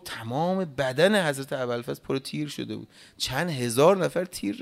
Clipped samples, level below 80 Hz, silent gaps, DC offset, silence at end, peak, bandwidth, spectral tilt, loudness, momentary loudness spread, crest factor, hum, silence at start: under 0.1%; -60 dBFS; none; under 0.1%; 0 s; -6 dBFS; 16 kHz; -5 dB/octave; -26 LUFS; 12 LU; 20 dB; none; 0.05 s